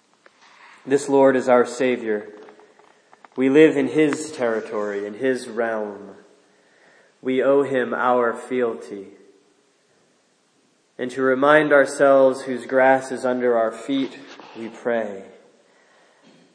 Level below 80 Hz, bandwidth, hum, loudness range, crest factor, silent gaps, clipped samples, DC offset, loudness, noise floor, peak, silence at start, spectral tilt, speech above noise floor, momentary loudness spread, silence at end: -82 dBFS; 10.5 kHz; none; 8 LU; 20 dB; none; under 0.1%; under 0.1%; -20 LUFS; -62 dBFS; 0 dBFS; 0.85 s; -5 dB/octave; 43 dB; 18 LU; 1.3 s